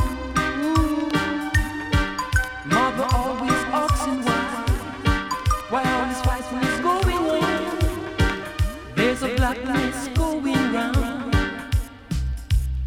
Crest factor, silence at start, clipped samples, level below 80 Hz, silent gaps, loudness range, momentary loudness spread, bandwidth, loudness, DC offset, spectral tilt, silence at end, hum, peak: 16 dB; 0 s; under 0.1%; -30 dBFS; none; 1 LU; 4 LU; 17.5 kHz; -23 LUFS; under 0.1%; -5.5 dB/octave; 0 s; none; -6 dBFS